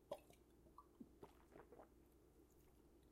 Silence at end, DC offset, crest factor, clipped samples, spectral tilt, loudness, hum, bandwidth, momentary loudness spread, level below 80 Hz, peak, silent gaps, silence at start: 0 s; under 0.1%; 28 dB; under 0.1%; -5.5 dB/octave; -64 LUFS; none; 15.5 kHz; 10 LU; -76 dBFS; -36 dBFS; none; 0 s